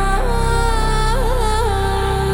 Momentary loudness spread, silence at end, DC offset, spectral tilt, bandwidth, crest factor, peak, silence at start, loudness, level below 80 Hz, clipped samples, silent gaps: 1 LU; 0 s; under 0.1%; -5 dB/octave; 16.5 kHz; 12 dB; -4 dBFS; 0 s; -18 LUFS; -18 dBFS; under 0.1%; none